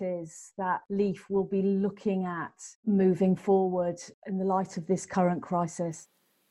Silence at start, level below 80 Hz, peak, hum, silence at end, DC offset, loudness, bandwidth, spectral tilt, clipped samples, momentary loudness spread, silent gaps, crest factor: 0 s; -68 dBFS; -12 dBFS; none; 0.45 s; under 0.1%; -29 LUFS; 11 kHz; -7.5 dB/octave; under 0.1%; 11 LU; 2.75-2.83 s, 4.14-4.22 s; 16 dB